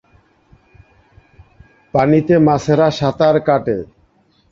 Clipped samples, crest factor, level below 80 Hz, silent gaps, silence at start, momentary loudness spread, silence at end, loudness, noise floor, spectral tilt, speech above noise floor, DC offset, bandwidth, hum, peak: under 0.1%; 16 dB; -48 dBFS; none; 1.95 s; 10 LU; 0.65 s; -15 LUFS; -56 dBFS; -7.5 dB/octave; 43 dB; under 0.1%; 7.6 kHz; none; -2 dBFS